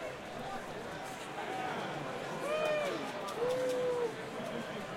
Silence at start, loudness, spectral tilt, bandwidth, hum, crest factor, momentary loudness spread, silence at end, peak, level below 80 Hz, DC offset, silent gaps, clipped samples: 0 s; -37 LUFS; -4.5 dB/octave; 16.5 kHz; none; 16 dB; 9 LU; 0 s; -22 dBFS; -68 dBFS; under 0.1%; none; under 0.1%